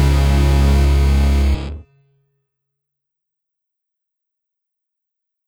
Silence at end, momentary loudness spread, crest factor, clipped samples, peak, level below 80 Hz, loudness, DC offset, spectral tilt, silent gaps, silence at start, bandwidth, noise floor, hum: 3.65 s; 12 LU; 14 dB; under 0.1%; -4 dBFS; -18 dBFS; -15 LUFS; under 0.1%; -6.5 dB/octave; none; 0 s; 15 kHz; -80 dBFS; none